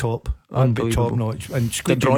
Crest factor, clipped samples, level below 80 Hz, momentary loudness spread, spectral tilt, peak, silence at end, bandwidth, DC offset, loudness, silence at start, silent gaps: 16 dB; under 0.1%; -34 dBFS; 6 LU; -6 dB/octave; -4 dBFS; 0 s; 18 kHz; under 0.1%; -22 LUFS; 0 s; none